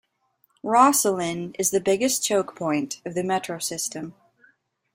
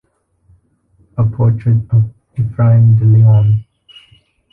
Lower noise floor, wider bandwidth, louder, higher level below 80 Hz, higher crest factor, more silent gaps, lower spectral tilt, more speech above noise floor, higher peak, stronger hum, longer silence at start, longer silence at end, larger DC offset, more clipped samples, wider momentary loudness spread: first, -68 dBFS vs -54 dBFS; first, 16.5 kHz vs 3.1 kHz; second, -23 LUFS vs -12 LUFS; second, -66 dBFS vs -40 dBFS; first, 22 dB vs 10 dB; neither; second, -3 dB/octave vs -11.5 dB/octave; about the same, 44 dB vs 45 dB; about the same, -2 dBFS vs -2 dBFS; neither; second, 0.65 s vs 1.15 s; about the same, 0.85 s vs 0.9 s; neither; neither; about the same, 12 LU vs 12 LU